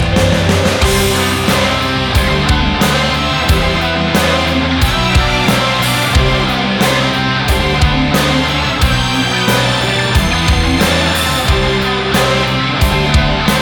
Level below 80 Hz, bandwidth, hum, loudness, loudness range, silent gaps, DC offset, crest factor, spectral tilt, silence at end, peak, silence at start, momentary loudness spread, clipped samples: -20 dBFS; over 20 kHz; none; -12 LUFS; 0 LU; none; 0.5%; 10 dB; -4.5 dB/octave; 0 s; -2 dBFS; 0 s; 2 LU; under 0.1%